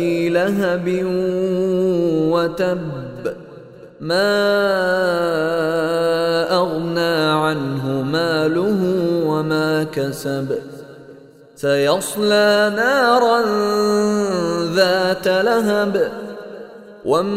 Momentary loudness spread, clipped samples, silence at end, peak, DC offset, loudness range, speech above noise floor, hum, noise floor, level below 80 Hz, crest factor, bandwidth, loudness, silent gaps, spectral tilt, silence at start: 11 LU; under 0.1%; 0 s; -2 dBFS; under 0.1%; 4 LU; 26 dB; none; -43 dBFS; -54 dBFS; 16 dB; 16 kHz; -18 LUFS; none; -5.5 dB/octave; 0 s